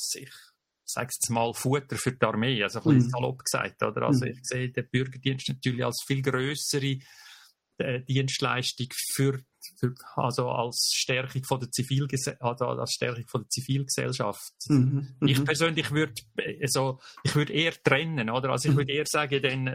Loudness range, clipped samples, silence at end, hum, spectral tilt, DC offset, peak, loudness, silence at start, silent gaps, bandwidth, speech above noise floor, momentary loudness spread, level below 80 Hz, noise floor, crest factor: 3 LU; under 0.1%; 0 s; none; -4.5 dB/octave; under 0.1%; -4 dBFS; -28 LUFS; 0 s; none; 16 kHz; 28 dB; 8 LU; -64 dBFS; -55 dBFS; 24 dB